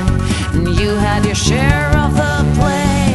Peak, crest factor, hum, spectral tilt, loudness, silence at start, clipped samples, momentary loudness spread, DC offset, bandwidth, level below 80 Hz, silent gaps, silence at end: 0 dBFS; 14 dB; none; -5.5 dB/octave; -14 LUFS; 0 s; under 0.1%; 3 LU; under 0.1%; 12 kHz; -22 dBFS; none; 0 s